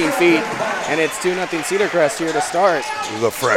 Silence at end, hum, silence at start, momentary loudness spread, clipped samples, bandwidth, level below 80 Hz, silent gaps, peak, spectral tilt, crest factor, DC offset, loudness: 0 s; none; 0 s; 6 LU; under 0.1%; 17 kHz; -58 dBFS; none; -2 dBFS; -3.5 dB/octave; 16 dB; under 0.1%; -18 LUFS